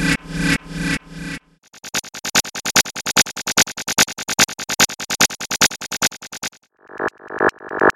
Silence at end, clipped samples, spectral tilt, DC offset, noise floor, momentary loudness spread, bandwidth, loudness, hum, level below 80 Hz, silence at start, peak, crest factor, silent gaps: 0.05 s; under 0.1%; -1.5 dB/octave; under 0.1%; -43 dBFS; 12 LU; 17 kHz; -18 LUFS; none; -42 dBFS; 0 s; 0 dBFS; 20 dB; none